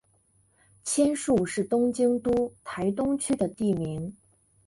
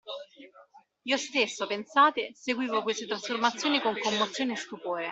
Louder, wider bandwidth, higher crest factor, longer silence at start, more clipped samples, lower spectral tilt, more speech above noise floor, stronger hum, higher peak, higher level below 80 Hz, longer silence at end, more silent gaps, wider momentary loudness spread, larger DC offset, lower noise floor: about the same, -27 LUFS vs -28 LUFS; first, 11.5 kHz vs 8.2 kHz; about the same, 16 dB vs 20 dB; first, 0.85 s vs 0.05 s; neither; first, -5.5 dB/octave vs -2.5 dB/octave; first, 40 dB vs 28 dB; neither; about the same, -12 dBFS vs -10 dBFS; first, -56 dBFS vs -76 dBFS; first, 0.55 s vs 0 s; neither; about the same, 9 LU vs 11 LU; neither; first, -66 dBFS vs -57 dBFS